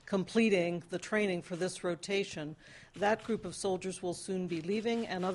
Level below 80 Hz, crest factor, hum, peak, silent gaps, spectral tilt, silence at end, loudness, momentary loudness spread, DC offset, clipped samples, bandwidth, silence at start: -68 dBFS; 18 dB; none; -16 dBFS; none; -5 dB/octave; 0 s; -34 LUFS; 10 LU; under 0.1%; under 0.1%; 11.5 kHz; 0.05 s